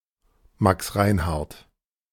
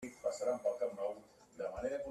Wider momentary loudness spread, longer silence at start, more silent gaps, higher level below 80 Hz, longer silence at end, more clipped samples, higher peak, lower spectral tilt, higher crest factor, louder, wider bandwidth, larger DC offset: about the same, 9 LU vs 11 LU; first, 0.6 s vs 0 s; neither; first, -40 dBFS vs -66 dBFS; first, 0.55 s vs 0 s; neither; first, -4 dBFS vs -24 dBFS; first, -6 dB/octave vs -4.5 dB/octave; first, 22 dB vs 16 dB; first, -23 LUFS vs -40 LUFS; first, 18 kHz vs 13.5 kHz; neither